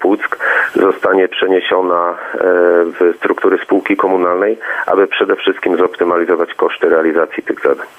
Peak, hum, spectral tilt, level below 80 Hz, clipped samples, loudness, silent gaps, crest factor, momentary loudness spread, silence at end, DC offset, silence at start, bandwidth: 0 dBFS; none; -5.5 dB/octave; -62 dBFS; under 0.1%; -13 LUFS; none; 12 dB; 4 LU; 0.1 s; under 0.1%; 0 s; 8.2 kHz